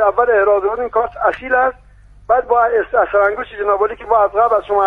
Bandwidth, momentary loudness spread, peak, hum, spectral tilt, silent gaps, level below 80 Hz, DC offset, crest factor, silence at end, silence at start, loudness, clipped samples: 4.2 kHz; 5 LU; 0 dBFS; none; -6.5 dB/octave; none; -44 dBFS; under 0.1%; 14 dB; 0 s; 0 s; -15 LUFS; under 0.1%